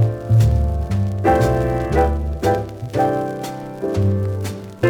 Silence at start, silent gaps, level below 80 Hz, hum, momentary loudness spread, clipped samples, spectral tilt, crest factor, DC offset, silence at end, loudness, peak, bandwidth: 0 s; none; -28 dBFS; none; 10 LU; under 0.1%; -7.5 dB/octave; 14 dB; under 0.1%; 0 s; -19 LUFS; -4 dBFS; 16.5 kHz